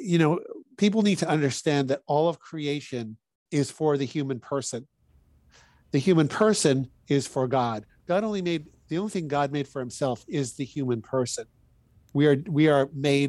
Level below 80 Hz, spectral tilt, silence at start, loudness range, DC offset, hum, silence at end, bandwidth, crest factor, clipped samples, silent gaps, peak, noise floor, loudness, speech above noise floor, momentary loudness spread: -64 dBFS; -5.5 dB/octave; 0 s; 5 LU; under 0.1%; none; 0 s; 12.5 kHz; 18 dB; under 0.1%; 3.35-3.46 s; -8 dBFS; -61 dBFS; -26 LUFS; 36 dB; 11 LU